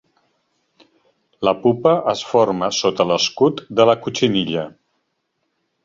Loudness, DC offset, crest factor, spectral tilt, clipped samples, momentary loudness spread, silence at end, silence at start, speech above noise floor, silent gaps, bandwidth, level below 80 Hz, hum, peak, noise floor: -18 LUFS; under 0.1%; 18 dB; -4.5 dB/octave; under 0.1%; 6 LU; 1.15 s; 1.4 s; 55 dB; none; 7.6 kHz; -58 dBFS; none; -2 dBFS; -72 dBFS